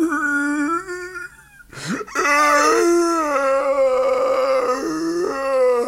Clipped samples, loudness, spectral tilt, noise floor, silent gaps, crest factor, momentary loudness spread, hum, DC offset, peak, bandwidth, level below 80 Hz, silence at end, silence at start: under 0.1%; -18 LUFS; -3.5 dB/octave; -44 dBFS; none; 14 dB; 15 LU; none; under 0.1%; -6 dBFS; 16 kHz; -54 dBFS; 0 s; 0 s